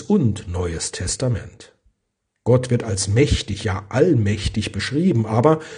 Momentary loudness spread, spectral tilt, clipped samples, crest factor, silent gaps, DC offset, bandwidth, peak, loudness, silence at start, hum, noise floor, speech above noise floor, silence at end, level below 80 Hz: 8 LU; -5.5 dB/octave; under 0.1%; 20 dB; none; under 0.1%; 10 kHz; 0 dBFS; -20 LUFS; 0 s; none; -75 dBFS; 56 dB; 0 s; -36 dBFS